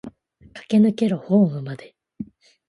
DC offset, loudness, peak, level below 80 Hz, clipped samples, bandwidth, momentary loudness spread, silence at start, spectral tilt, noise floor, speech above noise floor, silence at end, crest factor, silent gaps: under 0.1%; -20 LUFS; -6 dBFS; -62 dBFS; under 0.1%; 11 kHz; 20 LU; 0.05 s; -8.5 dB/octave; -47 dBFS; 28 dB; 0.45 s; 16 dB; none